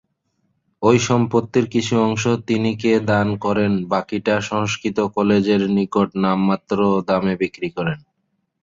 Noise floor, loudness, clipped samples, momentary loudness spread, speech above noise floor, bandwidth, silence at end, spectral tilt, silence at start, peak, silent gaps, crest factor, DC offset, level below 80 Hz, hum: -71 dBFS; -19 LUFS; under 0.1%; 5 LU; 53 dB; 7.6 kHz; 0.65 s; -6 dB/octave; 0.8 s; -2 dBFS; none; 18 dB; under 0.1%; -52 dBFS; none